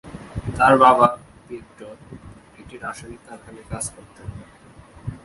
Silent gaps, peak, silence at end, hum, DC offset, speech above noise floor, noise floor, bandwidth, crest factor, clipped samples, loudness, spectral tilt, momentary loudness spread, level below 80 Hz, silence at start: none; 0 dBFS; 0.1 s; none; under 0.1%; 26 dB; -46 dBFS; 11.5 kHz; 22 dB; under 0.1%; -17 LUFS; -5 dB/octave; 28 LU; -46 dBFS; 0.05 s